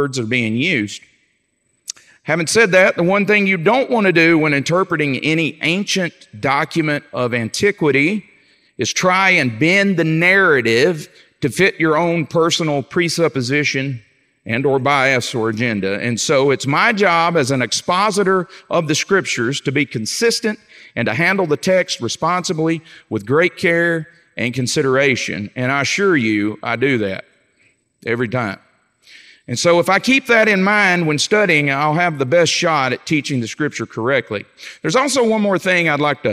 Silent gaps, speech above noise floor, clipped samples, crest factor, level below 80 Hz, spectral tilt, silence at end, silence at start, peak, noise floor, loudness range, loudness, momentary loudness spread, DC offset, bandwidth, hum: none; 49 dB; under 0.1%; 16 dB; -62 dBFS; -4.5 dB/octave; 0 s; 0 s; 0 dBFS; -65 dBFS; 4 LU; -16 LUFS; 11 LU; under 0.1%; 15.5 kHz; none